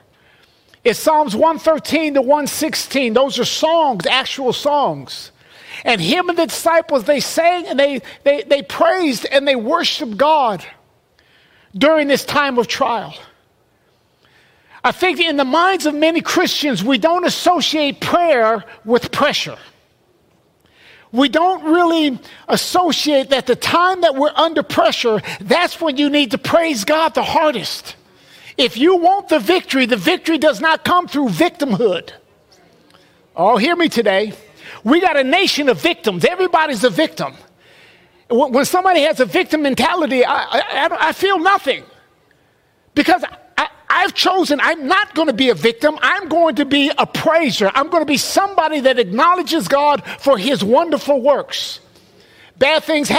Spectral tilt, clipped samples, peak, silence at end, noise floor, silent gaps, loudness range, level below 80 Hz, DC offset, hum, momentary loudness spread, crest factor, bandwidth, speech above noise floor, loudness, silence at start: -3.5 dB/octave; under 0.1%; 0 dBFS; 0 s; -58 dBFS; none; 3 LU; -56 dBFS; under 0.1%; none; 6 LU; 16 dB; 16 kHz; 43 dB; -15 LUFS; 0.85 s